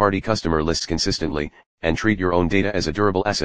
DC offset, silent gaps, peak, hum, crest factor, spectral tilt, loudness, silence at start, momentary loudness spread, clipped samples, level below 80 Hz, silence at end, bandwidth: 2%; 1.66-1.78 s; 0 dBFS; none; 20 dB; -5 dB/octave; -21 LUFS; 0 s; 7 LU; under 0.1%; -38 dBFS; 0 s; 10 kHz